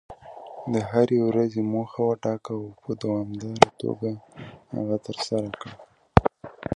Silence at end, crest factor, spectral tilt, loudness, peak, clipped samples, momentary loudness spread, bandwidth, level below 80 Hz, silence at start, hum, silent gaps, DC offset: 0 s; 26 dB; -6.5 dB/octave; -25 LUFS; 0 dBFS; under 0.1%; 18 LU; 11 kHz; -42 dBFS; 0.1 s; none; none; under 0.1%